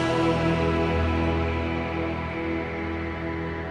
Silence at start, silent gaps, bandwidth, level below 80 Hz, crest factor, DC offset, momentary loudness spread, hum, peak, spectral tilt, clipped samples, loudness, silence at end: 0 s; none; 10 kHz; -36 dBFS; 14 dB; under 0.1%; 7 LU; none; -12 dBFS; -7 dB/octave; under 0.1%; -26 LUFS; 0 s